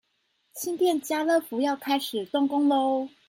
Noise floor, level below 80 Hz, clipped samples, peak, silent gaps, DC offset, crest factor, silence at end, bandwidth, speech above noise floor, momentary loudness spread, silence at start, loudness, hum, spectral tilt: -72 dBFS; -78 dBFS; under 0.1%; -12 dBFS; none; under 0.1%; 14 dB; 0.2 s; 17 kHz; 47 dB; 7 LU; 0.55 s; -26 LUFS; none; -3 dB/octave